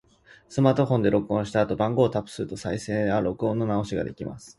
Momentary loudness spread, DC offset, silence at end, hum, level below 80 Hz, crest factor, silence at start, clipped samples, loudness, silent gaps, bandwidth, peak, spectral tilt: 10 LU; under 0.1%; 0.1 s; none; -52 dBFS; 20 dB; 0.5 s; under 0.1%; -25 LUFS; none; 11.5 kHz; -4 dBFS; -7 dB/octave